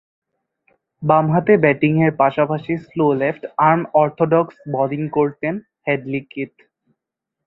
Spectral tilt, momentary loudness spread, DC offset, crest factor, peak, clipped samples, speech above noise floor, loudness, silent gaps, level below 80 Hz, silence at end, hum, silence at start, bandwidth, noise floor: -10.5 dB/octave; 11 LU; under 0.1%; 18 dB; 0 dBFS; under 0.1%; 65 dB; -18 LUFS; none; -60 dBFS; 1 s; none; 1 s; 4.1 kHz; -82 dBFS